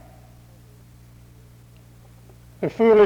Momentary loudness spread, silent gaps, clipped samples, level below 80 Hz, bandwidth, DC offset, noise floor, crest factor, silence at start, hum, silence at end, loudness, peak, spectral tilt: 26 LU; none; under 0.1%; -54 dBFS; 7.4 kHz; under 0.1%; -48 dBFS; 18 dB; 2.6 s; 60 Hz at -55 dBFS; 0 s; -21 LUFS; -6 dBFS; -7.5 dB/octave